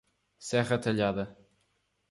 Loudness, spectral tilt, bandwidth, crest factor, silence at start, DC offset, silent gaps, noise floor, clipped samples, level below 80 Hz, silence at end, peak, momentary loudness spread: -30 LUFS; -5.5 dB/octave; 11.5 kHz; 18 dB; 0.4 s; under 0.1%; none; -75 dBFS; under 0.1%; -62 dBFS; 0.8 s; -14 dBFS; 13 LU